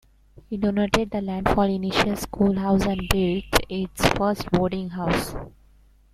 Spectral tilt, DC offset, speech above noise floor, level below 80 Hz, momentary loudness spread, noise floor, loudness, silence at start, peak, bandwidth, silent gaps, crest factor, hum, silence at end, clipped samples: -5.5 dB/octave; under 0.1%; 32 dB; -38 dBFS; 6 LU; -55 dBFS; -23 LUFS; 0.5 s; 0 dBFS; 16.5 kHz; none; 24 dB; none; 0.65 s; under 0.1%